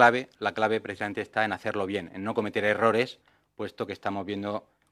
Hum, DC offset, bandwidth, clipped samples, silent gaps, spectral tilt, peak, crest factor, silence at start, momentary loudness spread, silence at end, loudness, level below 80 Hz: none; under 0.1%; 14 kHz; under 0.1%; none; -5.5 dB/octave; -4 dBFS; 24 dB; 0 s; 11 LU; 0.3 s; -29 LUFS; -72 dBFS